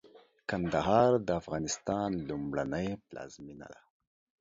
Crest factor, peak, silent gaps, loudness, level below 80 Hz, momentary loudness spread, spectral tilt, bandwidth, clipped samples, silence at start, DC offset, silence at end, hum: 22 dB; -12 dBFS; none; -31 LUFS; -58 dBFS; 21 LU; -5.5 dB/octave; 7.8 kHz; under 0.1%; 0.05 s; under 0.1%; 0.65 s; none